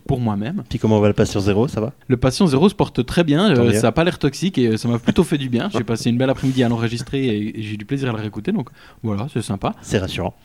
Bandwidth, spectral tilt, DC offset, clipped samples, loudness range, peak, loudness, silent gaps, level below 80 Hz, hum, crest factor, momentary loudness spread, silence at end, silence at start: 15.5 kHz; -6.5 dB/octave; 0.2%; under 0.1%; 6 LU; -2 dBFS; -19 LUFS; none; -42 dBFS; none; 16 dB; 10 LU; 0.15 s; 0.1 s